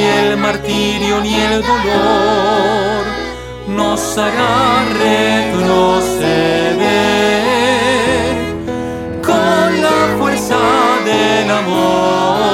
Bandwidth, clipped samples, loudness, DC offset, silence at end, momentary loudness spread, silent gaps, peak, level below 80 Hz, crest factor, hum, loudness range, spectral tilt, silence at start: 16.5 kHz; under 0.1%; -13 LUFS; under 0.1%; 0 s; 6 LU; none; 0 dBFS; -36 dBFS; 12 dB; none; 2 LU; -4.5 dB/octave; 0 s